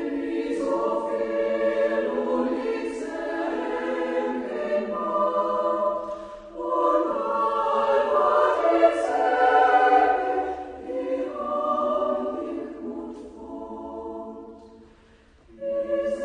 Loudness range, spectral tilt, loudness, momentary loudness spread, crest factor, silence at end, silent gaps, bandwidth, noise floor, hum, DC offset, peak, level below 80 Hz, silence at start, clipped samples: 11 LU; -5 dB/octave; -24 LUFS; 16 LU; 18 dB; 0 s; none; 10 kHz; -55 dBFS; none; under 0.1%; -6 dBFS; -58 dBFS; 0 s; under 0.1%